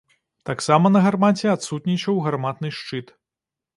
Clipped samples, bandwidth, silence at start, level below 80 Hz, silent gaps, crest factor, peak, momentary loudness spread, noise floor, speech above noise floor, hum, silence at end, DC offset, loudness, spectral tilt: under 0.1%; 11.5 kHz; 0.45 s; -64 dBFS; none; 20 dB; -2 dBFS; 15 LU; -88 dBFS; 68 dB; none; 0.75 s; under 0.1%; -20 LUFS; -6 dB/octave